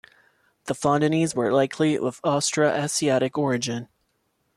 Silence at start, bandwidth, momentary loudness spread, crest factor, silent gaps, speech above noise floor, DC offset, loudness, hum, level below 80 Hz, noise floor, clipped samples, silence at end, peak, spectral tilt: 0.65 s; 14 kHz; 7 LU; 16 dB; none; 49 dB; under 0.1%; -23 LUFS; none; -64 dBFS; -71 dBFS; under 0.1%; 0.7 s; -8 dBFS; -4.5 dB/octave